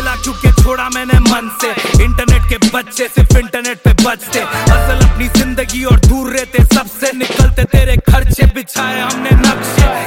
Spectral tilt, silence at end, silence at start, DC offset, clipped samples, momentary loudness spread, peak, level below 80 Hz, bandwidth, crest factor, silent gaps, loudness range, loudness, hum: -5 dB/octave; 0 s; 0 s; under 0.1%; under 0.1%; 6 LU; 0 dBFS; -12 dBFS; 17 kHz; 10 dB; none; 1 LU; -12 LUFS; none